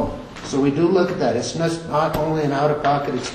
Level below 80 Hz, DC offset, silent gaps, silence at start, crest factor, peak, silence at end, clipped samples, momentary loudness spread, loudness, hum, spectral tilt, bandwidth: -44 dBFS; under 0.1%; none; 0 s; 14 dB; -6 dBFS; 0 s; under 0.1%; 6 LU; -20 LUFS; none; -6 dB/octave; 13.5 kHz